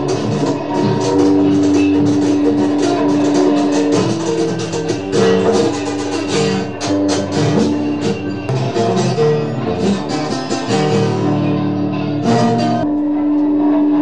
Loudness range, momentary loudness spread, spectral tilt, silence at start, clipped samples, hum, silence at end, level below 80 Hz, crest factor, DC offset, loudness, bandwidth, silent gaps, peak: 3 LU; 7 LU; -6 dB/octave; 0 s; under 0.1%; none; 0 s; -46 dBFS; 14 dB; 1%; -15 LUFS; 10.5 kHz; none; -2 dBFS